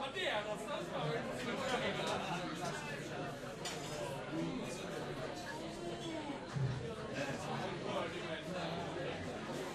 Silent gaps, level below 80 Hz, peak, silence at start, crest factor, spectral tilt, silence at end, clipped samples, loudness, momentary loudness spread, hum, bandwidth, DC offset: none; -64 dBFS; -26 dBFS; 0 s; 16 dB; -4.5 dB/octave; 0 s; under 0.1%; -41 LUFS; 6 LU; none; 13 kHz; under 0.1%